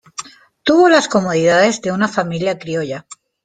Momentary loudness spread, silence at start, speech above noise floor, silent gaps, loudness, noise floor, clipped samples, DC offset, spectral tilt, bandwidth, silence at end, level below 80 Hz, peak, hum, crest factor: 16 LU; 0.2 s; 20 dB; none; -15 LUFS; -34 dBFS; under 0.1%; under 0.1%; -4.5 dB/octave; 9.4 kHz; 0.3 s; -58 dBFS; -2 dBFS; none; 14 dB